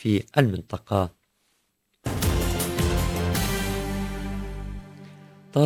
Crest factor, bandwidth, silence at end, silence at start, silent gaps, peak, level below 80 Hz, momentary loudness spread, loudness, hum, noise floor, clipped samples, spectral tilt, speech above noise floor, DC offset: 22 dB; 16 kHz; 0 s; 0 s; none; -4 dBFS; -34 dBFS; 15 LU; -26 LUFS; none; -72 dBFS; under 0.1%; -5.5 dB/octave; 48 dB; under 0.1%